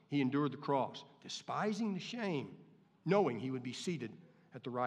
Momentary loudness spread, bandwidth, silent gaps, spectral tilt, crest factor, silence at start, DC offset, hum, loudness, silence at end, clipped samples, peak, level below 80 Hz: 15 LU; 11 kHz; none; -6 dB/octave; 20 dB; 0.1 s; under 0.1%; none; -38 LUFS; 0 s; under 0.1%; -18 dBFS; under -90 dBFS